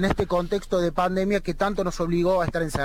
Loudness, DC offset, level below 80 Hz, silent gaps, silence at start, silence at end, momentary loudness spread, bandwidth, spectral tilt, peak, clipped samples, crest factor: -24 LUFS; under 0.1%; -36 dBFS; none; 0 s; 0 s; 3 LU; 16.5 kHz; -6 dB/octave; -8 dBFS; under 0.1%; 16 dB